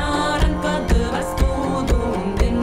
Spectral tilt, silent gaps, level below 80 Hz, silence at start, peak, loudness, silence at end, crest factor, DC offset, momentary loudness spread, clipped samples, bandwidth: -6 dB/octave; none; -22 dBFS; 0 s; -8 dBFS; -21 LUFS; 0 s; 12 dB; under 0.1%; 2 LU; under 0.1%; 16 kHz